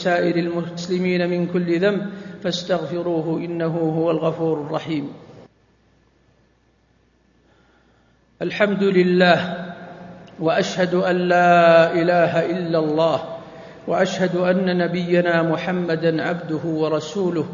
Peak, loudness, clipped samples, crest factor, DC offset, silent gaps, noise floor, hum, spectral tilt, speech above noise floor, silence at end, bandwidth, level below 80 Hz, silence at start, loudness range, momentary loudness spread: 0 dBFS; -20 LUFS; under 0.1%; 20 dB; under 0.1%; none; -60 dBFS; none; -6.5 dB/octave; 41 dB; 0 s; 7.4 kHz; -62 dBFS; 0 s; 9 LU; 13 LU